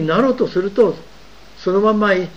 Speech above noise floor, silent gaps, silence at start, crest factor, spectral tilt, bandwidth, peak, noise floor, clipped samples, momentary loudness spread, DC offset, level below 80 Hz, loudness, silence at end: 27 dB; none; 0 s; 14 dB; -7 dB/octave; 7.8 kHz; -2 dBFS; -43 dBFS; under 0.1%; 7 LU; 0.9%; -50 dBFS; -17 LUFS; 0.05 s